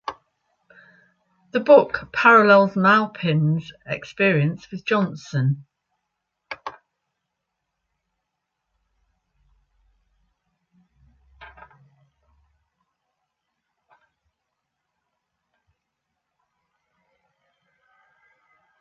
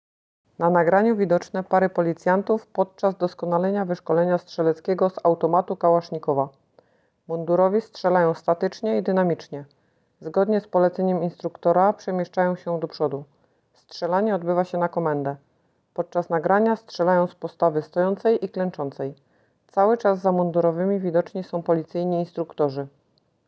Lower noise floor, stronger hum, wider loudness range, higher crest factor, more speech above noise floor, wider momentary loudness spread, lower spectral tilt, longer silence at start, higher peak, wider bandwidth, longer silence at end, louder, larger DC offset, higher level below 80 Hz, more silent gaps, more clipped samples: first, -80 dBFS vs -66 dBFS; neither; first, 27 LU vs 3 LU; about the same, 22 dB vs 18 dB; first, 61 dB vs 44 dB; first, 21 LU vs 9 LU; about the same, -7.5 dB/octave vs -8 dB/octave; second, 0.1 s vs 0.6 s; about the same, -2 dBFS vs -4 dBFS; about the same, 7.2 kHz vs 7.4 kHz; first, 7.35 s vs 0.6 s; first, -19 LUFS vs -23 LUFS; neither; first, -64 dBFS vs -72 dBFS; neither; neither